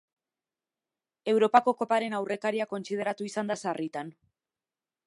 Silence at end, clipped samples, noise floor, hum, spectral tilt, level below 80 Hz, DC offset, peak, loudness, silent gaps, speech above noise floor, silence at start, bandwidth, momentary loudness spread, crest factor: 0.95 s; under 0.1%; under -90 dBFS; none; -5 dB/octave; -84 dBFS; under 0.1%; -6 dBFS; -28 LUFS; none; over 62 dB; 1.25 s; 11.5 kHz; 13 LU; 24 dB